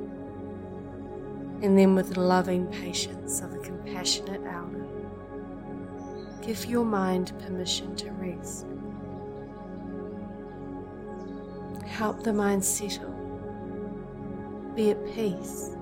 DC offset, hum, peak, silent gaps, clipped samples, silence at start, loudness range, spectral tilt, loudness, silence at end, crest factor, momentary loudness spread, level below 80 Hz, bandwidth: under 0.1%; none; -8 dBFS; none; under 0.1%; 0 s; 11 LU; -4.5 dB/octave; -30 LUFS; 0 s; 22 dB; 15 LU; -54 dBFS; 16.5 kHz